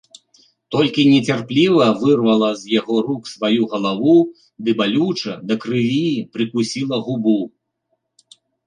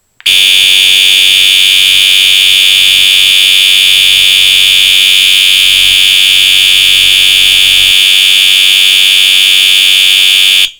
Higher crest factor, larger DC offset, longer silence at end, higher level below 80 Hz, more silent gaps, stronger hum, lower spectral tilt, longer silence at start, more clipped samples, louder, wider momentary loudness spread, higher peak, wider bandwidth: first, 16 dB vs 6 dB; neither; first, 1.2 s vs 0.1 s; second, -62 dBFS vs -42 dBFS; neither; neither; first, -6 dB/octave vs 3 dB/octave; first, 0.7 s vs 0.25 s; second, under 0.1% vs 0.8%; second, -18 LUFS vs -2 LUFS; first, 9 LU vs 0 LU; about the same, -2 dBFS vs 0 dBFS; second, 10 kHz vs over 20 kHz